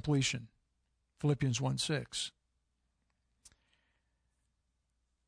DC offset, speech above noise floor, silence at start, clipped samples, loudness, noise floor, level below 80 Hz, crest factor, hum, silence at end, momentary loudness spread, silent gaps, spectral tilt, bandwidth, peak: under 0.1%; 47 dB; 0.05 s; under 0.1%; -35 LUFS; -81 dBFS; -64 dBFS; 18 dB; none; 3 s; 8 LU; none; -4.5 dB/octave; 10.5 kHz; -20 dBFS